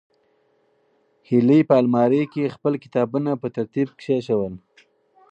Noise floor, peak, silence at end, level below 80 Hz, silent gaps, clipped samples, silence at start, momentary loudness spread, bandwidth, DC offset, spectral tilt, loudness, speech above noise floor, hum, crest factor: -64 dBFS; -2 dBFS; 0.75 s; -64 dBFS; none; under 0.1%; 1.3 s; 10 LU; 8 kHz; under 0.1%; -9 dB/octave; -21 LUFS; 44 dB; none; 20 dB